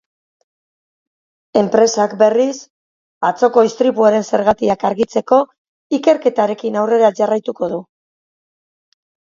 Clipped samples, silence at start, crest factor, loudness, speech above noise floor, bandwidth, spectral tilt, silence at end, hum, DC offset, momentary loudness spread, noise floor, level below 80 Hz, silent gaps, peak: under 0.1%; 1.55 s; 16 dB; -15 LUFS; over 76 dB; 7.6 kHz; -5 dB/octave; 1.55 s; none; under 0.1%; 8 LU; under -90 dBFS; -58 dBFS; 2.70-3.21 s, 5.58-5.90 s; 0 dBFS